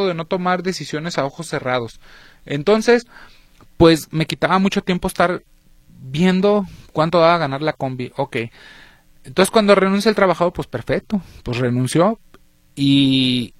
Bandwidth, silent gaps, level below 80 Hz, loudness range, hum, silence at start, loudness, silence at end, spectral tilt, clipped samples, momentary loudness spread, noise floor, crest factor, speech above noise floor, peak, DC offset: 15 kHz; none; -44 dBFS; 2 LU; none; 0 s; -18 LUFS; 0.15 s; -5.5 dB/octave; under 0.1%; 12 LU; -50 dBFS; 18 dB; 32 dB; 0 dBFS; under 0.1%